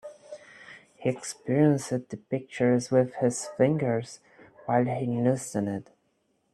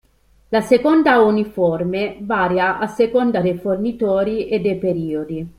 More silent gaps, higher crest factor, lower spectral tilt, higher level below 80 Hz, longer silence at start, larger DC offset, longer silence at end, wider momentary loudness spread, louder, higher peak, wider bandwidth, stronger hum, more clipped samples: neither; about the same, 20 dB vs 16 dB; about the same, -6.5 dB/octave vs -7 dB/octave; second, -68 dBFS vs -50 dBFS; second, 0.05 s vs 0.5 s; neither; first, 0.7 s vs 0.1 s; first, 22 LU vs 8 LU; second, -27 LUFS vs -18 LUFS; second, -8 dBFS vs -2 dBFS; second, 12.5 kHz vs 15 kHz; neither; neither